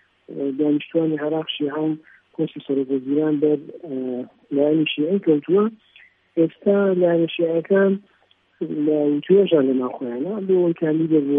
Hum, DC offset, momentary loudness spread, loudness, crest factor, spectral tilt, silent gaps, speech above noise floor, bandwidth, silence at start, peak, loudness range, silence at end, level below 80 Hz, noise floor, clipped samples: none; under 0.1%; 11 LU; -21 LUFS; 16 dB; -10.5 dB/octave; none; 40 dB; 3.8 kHz; 0.3 s; -4 dBFS; 4 LU; 0 s; -76 dBFS; -60 dBFS; under 0.1%